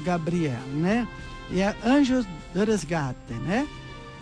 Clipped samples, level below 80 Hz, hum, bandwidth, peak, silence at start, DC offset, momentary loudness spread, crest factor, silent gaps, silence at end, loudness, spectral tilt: under 0.1%; -44 dBFS; none; 11 kHz; -12 dBFS; 0 s; under 0.1%; 13 LU; 14 dB; none; 0 s; -26 LUFS; -6.5 dB/octave